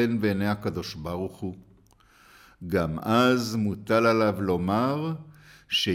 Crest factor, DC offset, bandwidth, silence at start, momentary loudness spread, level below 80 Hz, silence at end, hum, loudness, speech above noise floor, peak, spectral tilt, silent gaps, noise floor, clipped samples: 16 dB; under 0.1%; 16.5 kHz; 0 s; 12 LU; -54 dBFS; 0 s; none; -26 LUFS; 33 dB; -10 dBFS; -6 dB/octave; none; -58 dBFS; under 0.1%